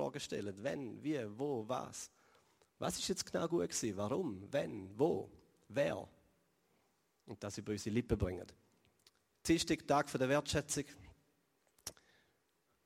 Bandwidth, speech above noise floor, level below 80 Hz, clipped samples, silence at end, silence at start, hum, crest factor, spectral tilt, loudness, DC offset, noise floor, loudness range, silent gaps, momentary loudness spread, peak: 16 kHz; 41 dB; -60 dBFS; under 0.1%; 0.95 s; 0 s; none; 22 dB; -4.5 dB/octave; -39 LUFS; under 0.1%; -79 dBFS; 5 LU; none; 16 LU; -20 dBFS